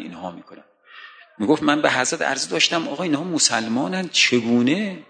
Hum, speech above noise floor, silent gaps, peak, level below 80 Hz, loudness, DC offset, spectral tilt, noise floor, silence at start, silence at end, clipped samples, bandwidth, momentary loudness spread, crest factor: none; 23 dB; none; -2 dBFS; -68 dBFS; -19 LUFS; under 0.1%; -3 dB/octave; -44 dBFS; 0 s; 0.1 s; under 0.1%; 9.6 kHz; 8 LU; 20 dB